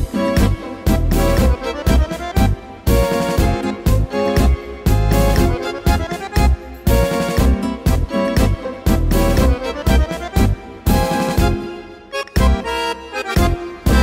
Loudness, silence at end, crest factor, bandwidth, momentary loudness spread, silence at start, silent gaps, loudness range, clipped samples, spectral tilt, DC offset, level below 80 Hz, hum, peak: -18 LUFS; 0 s; 14 dB; 16.5 kHz; 6 LU; 0 s; none; 1 LU; under 0.1%; -6 dB/octave; under 0.1%; -20 dBFS; none; -2 dBFS